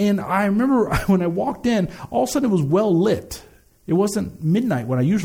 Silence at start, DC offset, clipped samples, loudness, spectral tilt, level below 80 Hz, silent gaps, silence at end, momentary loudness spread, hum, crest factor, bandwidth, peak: 0 s; under 0.1%; under 0.1%; -20 LUFS; -6.5 dB/octave; -42 dBFS; none; 0 s; 6 LU; none; 14 dB; 18 kHz; -6 dBFS